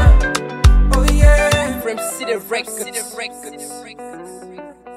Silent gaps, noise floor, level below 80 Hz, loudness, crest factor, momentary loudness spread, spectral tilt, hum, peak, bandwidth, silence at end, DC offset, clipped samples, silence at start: none; -35 dBFS; -16 dBFS; -17 LUFS; 14 dB; 21 LU; -5 dB/octave; none; 0 dBFS; 15 kHz; 0 s; under 0.1%; under 0.1%; 0 s